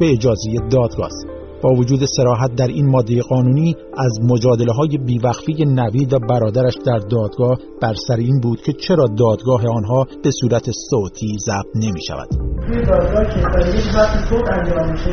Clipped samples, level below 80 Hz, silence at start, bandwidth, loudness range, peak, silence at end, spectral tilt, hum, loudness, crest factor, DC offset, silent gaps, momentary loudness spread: under 0.1%; -26 dBFS; 0 s; 6.6 kHz; 3 LU; 0 dBFS; 0 s; -7 dB/octave; none; -17 LUFS; 14 dB; under 0.1%; none; 6 LU